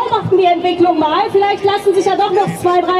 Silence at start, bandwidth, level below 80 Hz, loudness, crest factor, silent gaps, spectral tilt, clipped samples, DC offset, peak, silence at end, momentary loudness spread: 0 s; 14 kHz; -52 dBFS; -13 LUFS; 12 dB; none; -5.5 dB/octave; under 0.1%; under 0.1%; -2 dBFS; 0 s; 2 LU